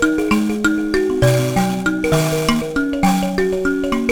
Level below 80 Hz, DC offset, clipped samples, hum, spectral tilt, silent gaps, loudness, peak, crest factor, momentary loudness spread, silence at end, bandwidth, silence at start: -36 dBFS; under 0.1%; under 0.1%; none; -5.5 dB/octave; none; -17 LUFS; 0 dBFS; 16 dB; 3 LU; 0 s; over 20 kHz; 0 s